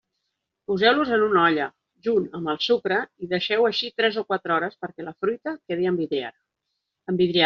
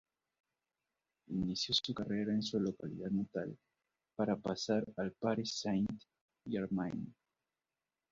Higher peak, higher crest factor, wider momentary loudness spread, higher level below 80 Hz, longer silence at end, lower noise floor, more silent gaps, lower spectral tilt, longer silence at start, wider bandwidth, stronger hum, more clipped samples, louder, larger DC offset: first, -4 dBFS vs -18 dBFS; about the same, 20 dB vs 20 dB; about the same, 12 LU vs 10 LU; about the same, -66 dBFS vs -68 dBFS; second, 0 s vs 1 s; second, -80 dBFS vs under -90 dBFS; second, none vs 6.21-6.28 s; second, -2.5 dB/octave vs -5 dB/octave; second, 0.7 s vs 1.3 s; about the same, 6.8 kHz vs 7.4 kHz; neither; neither; first, -23 LUFS vs -38 LUFS; neither